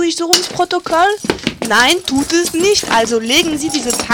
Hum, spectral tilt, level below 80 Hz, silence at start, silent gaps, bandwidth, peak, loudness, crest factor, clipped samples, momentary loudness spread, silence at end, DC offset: none; -2 dB/octave; -44 dBFS; 0 s; none; 19 kHz; 0 dBFS; -13 LUFS; 14 dB; under 0.1%; 6 LU; 0 s; under 0.1%